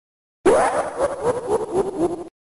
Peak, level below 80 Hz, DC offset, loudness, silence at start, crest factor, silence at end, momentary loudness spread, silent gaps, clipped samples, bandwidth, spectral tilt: -8 dBFS; -48 dBFS; under 0.1%; -21 LUFS; 0.45 s; 14 dB; 0.25 s; 7 LU; none; under 0.1%; 11.5 kHz; -5 dB/octave